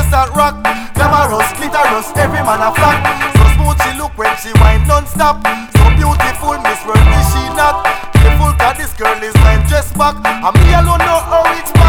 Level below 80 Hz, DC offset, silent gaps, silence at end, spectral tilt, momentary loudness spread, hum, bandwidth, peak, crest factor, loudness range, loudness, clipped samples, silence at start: -14 dBFS; under 0.1%; none; 0 s; -5.5 dB/octave; 6 LU; none; over 20 kHz; 0 dBFS; 10 dB; 1 LU; -11 LUFS; 0.7%; 0 s